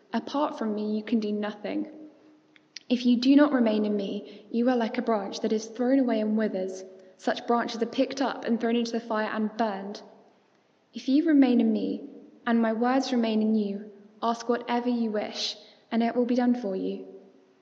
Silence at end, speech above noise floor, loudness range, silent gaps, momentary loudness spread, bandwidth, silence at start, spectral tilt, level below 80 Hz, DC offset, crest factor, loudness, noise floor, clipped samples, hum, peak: 0.4 s; 39 dB; 4 LU; none; 14 LU; 7.6 kHz; 0.1 s; -5.5 dB/octave; -86 dBFS; under 0.1%; 20 dB; -27 LUFS; -65 dBFS; under 0.1%; none; -8 dBFS